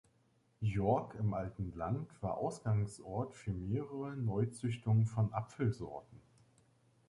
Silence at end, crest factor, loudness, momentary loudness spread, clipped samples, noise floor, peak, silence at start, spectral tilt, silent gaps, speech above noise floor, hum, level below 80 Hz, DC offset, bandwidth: 0.9 s; 18 dB; -38 LUFS; 9 LU; under 0.1%; -73 dBFS; -20 dBFS; 0.6 s; -8.5 dB/octave; none; 37 dB; none; -58 dBFS; under 0.1%; 11.5 kHz